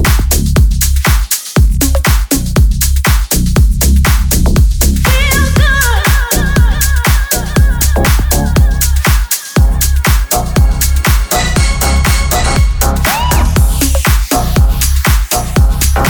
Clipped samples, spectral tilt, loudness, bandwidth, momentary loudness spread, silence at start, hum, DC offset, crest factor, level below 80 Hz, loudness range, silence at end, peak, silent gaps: under 0.1%; -4 dB/octave; -11 LUFS; over 20 kHz; 2 LU; 0 s; none; under 0.1%; 10 dB; -10 dBFS; 1 LU; 0 s; 0 dBFS; none